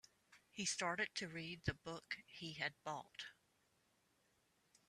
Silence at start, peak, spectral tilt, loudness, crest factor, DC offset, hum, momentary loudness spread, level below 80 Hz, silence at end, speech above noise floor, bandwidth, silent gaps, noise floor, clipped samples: 0.3 s; -26 dBFS; -2.5 dB/octave; -45 LUFS; 24 dB; under 0.1%; none; 13 LU; -72 dBFS; 1.55 s; 33 dB; 13.5 kHz; none; -80 dBFS; under 0.1%